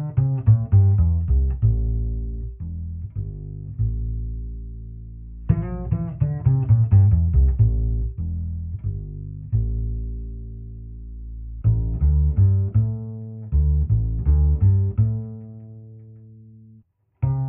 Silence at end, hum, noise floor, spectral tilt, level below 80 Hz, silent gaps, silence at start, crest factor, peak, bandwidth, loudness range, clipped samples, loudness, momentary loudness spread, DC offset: 0 s; none; -54 dBFS; -13 dB/octave; -26 dBFS; none; 0 s; 16 dB; -4 dBFS; 2.3 kHz; 9 LU; under 0.1%; -22 LUFS; 19 LU; under 0.1%